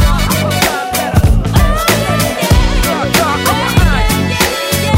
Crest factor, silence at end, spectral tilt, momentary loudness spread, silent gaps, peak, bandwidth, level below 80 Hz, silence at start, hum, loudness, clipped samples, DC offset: 12 dB; 0 s; -4.5 dB/octave; 2 LU; none; 0 dBFS; 16.5 kHz; -16 dBFS; 0 s; none; -12 LUFS; under 0.1%; under 0.1%